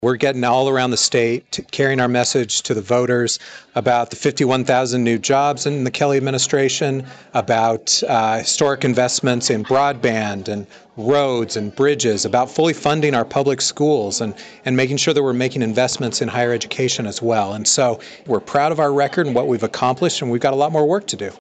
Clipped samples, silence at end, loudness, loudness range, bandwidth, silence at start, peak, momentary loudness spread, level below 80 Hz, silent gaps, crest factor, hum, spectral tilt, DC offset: under 0.1%; 0.05 s; -18 LUFS; 1 LU; 9.4 kHz; 0 s; -6 dBFS; 6 LU; -60 dBFS; none; 12 dB; none; -4 dB/octave; under 0.1%